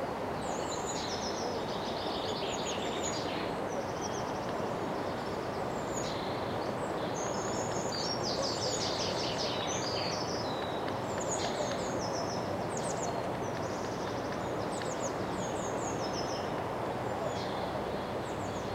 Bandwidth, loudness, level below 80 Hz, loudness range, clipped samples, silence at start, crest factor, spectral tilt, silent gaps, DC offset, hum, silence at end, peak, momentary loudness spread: 16 kHz; -34 LUFS; -58 dBFS; 2 LU; under 0.1%; 0 s; 16 dB; -4 dB/octave; none; under 0.1%; none; 0 s; -20 dBFS; 3 LU